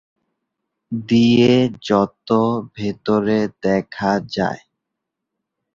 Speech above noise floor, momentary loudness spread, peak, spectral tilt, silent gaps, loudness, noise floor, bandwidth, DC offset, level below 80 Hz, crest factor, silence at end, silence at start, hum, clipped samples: 63 dB; 12 LU; -2 dBFS; -7 dB/octave; none; -18 LUFS; -80 dBFS; 7.4 kHz; under 0.1%; -54 dBFS; 18 dB; 1.2 s; 0.9 s; none; under 0.1%